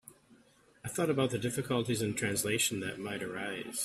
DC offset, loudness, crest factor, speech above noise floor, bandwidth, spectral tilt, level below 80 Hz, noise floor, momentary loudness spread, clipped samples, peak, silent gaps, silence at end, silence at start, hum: under 0.1%; -33 LUFS; 18 dB; 31 dB; 15.5 kHz; -4 dB/octave; -66 dBFS; -64 dBFS; 8 LU; under 0.1%; -16 dBFS; none; 0 s; 0.05 s; none